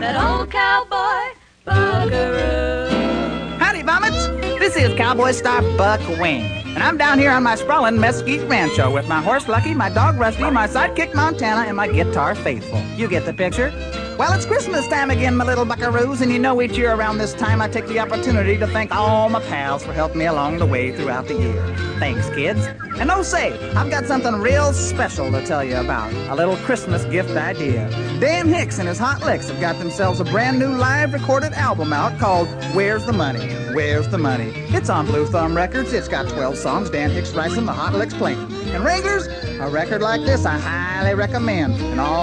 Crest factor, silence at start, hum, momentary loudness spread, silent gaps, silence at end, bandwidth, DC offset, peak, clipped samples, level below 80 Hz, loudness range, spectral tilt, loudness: 16 dB; 0 s; none; 6 LU; none; 0 s; 10 kHz; under 0.1%; -2 dBFS; under 0.1%; -34 dBFS; 4 LU; -5.5 dB/octave; -19 LUFS